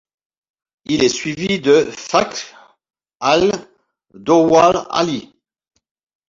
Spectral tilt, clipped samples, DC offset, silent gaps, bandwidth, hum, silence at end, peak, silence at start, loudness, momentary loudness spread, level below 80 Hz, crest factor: -4.5 dB/octave; under 0.1%; under 0.1%; none; 7.8 kHz; none; 1.05 s; 0 dBFS; 0.9 s; -16 LUFS; 15 LU; -52 dBFS; 18 dB